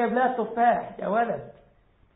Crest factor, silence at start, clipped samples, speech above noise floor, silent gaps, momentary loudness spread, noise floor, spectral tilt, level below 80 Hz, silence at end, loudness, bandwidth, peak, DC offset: 16 dB; 0 s; under 0.1%; 36 dB; none; 6 LU; -60 dBFS; -10.5 dB/octave; -64 dBFS; 0.65 s; -25 LUFS; 4 kHz; -10 dBFS; under 0.1%